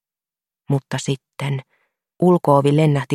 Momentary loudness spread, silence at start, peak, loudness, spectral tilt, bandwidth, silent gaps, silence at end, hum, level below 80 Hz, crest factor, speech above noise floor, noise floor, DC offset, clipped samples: 11 LU; 0.7 s; 0 dBFS; -19 LUFS; -7 dB/octave; 12 kHz; none; 0 s; none; -60 dBFS; 18 dB; over 73 dB; under -90 dBFS; under 0.1%; under 0.1%